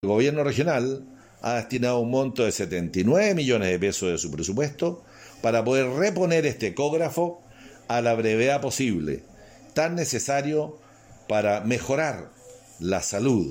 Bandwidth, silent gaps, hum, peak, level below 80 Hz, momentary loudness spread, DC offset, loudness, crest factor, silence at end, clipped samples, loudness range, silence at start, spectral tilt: 16.5 kHz; none; none; -10 dBFS; -58 dBFS; 9 LU; under 0.1%; -25 LUFS; 16 dB; 0 s; under 0.1%; 3 LU; 0.05 s; -5 dB/octave